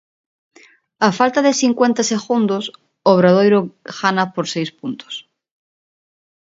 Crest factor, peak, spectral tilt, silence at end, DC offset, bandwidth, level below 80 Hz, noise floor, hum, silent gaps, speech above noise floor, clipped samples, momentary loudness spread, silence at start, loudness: 18 dB; 0 dBFS; -5 dB/octave; 1.25 s; under 0.1%; 7.8 kHz; -66 dBFS; -38 dBFS; none; none; 22 dB; under 0.1%; 17 LU; 1 s; -16 LUFS